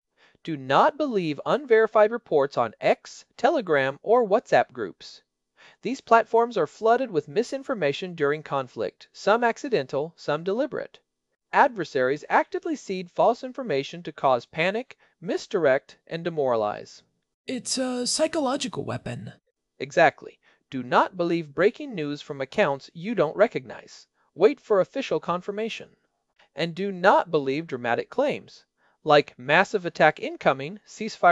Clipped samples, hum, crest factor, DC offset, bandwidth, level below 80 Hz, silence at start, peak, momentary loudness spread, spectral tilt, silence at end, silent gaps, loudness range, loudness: under 0.1%; none; 22 dB; under 0.1%; 12 kHz; -70 dBFS; 0.45 s; -2 dBFS; 14 LU; -4.5 dB/octave; 0 s; 17.34-17.44 s; 4 LU; -24 LUFS